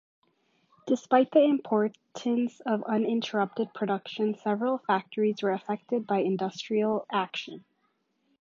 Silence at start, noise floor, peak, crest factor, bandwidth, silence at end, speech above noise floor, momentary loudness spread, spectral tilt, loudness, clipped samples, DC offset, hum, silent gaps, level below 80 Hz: 0.85 s; -74 dBFS; -8 dBFS; 20 dB; 7.6 kHz; 0.8 s; 47 dB; 9 LU; -6 dB/octave; -28 LUFS; under 0.1%; under 0.1%; none; none; -82 dBFS